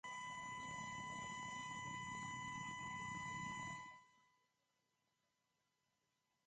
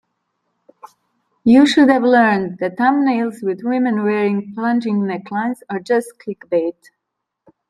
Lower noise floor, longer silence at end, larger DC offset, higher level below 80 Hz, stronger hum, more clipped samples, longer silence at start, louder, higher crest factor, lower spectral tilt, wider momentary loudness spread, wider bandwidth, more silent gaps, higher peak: first, -87 dBFS vs -78 dBFS; first, 2.25 s vs 1 s; neither; second, -76 dBFS vs -62 dBFS; neither; neither; second, 0.05 s vs 0.85 s; second, -48 LUFS vs -17 LUFS; about the same, 14 dB vs 16 dB; second, -3 dB/octave vs -6 dB/octave; second, 2 LU vs 11 LU; second, 9.6 kHz vs 12.5 kHz; neither; second, -36 dBFS vs -2 dBFS